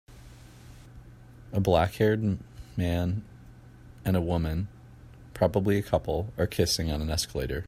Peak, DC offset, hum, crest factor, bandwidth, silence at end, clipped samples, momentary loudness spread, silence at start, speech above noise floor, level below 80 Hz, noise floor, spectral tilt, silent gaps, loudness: -8 dBFS; under 0.1%; none; 20 dB; 15.5 kHz; 0.05 s; under 0.1%; 11 LU; 0.1 s; 23 dB; -44 dBFS; -50 dBFS; -5.5 dB/octave; none; -28 LUFS